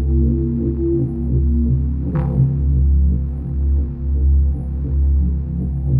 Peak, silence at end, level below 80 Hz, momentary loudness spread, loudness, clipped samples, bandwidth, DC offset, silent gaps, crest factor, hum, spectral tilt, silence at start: -4 dBFS; 0 s; -18 dBFS; 6 LU; -19 LUFS; under 0.1%; 1.8 kHz; under 0.1%; none; 12 dB; none; -13.5 dB/octave; 0 s